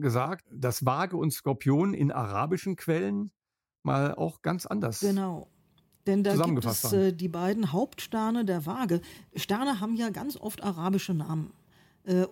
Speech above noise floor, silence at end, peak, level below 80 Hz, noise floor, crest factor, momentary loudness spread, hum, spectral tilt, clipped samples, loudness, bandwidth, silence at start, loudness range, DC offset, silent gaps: 37 dB; 0 s; -10 dBFS; -66 dBFS; -66 dBFS; 20 dB; 9 LU; none; -6 dB/octave; under 0.1%; -29 LUFS; 17 kHz; 0 s; 3 LU; under 0.1%; none